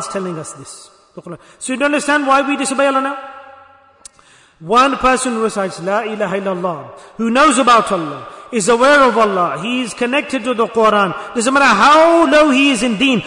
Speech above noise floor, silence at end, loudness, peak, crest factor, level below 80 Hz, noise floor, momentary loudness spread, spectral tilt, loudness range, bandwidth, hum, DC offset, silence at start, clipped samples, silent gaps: 34 dB; 0 s; -13 LUFS; 0 dBFS; 14 dB; -48 dBFS; -48 dBFS; 18 LU; -3.5 dB/octave; 5 LU; 11 kHz; none; under 0.1%; 0 s; under 0.1%; none